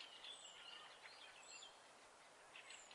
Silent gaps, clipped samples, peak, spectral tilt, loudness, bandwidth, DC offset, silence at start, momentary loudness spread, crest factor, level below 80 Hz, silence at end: none; under 0.1%; -42 dBFS; 0.5 dB/octave; -58 LUFS; 12 kHz; under 0.1%; 0 s; 9 LU; 18 dB; under -90 dBFS; 0 s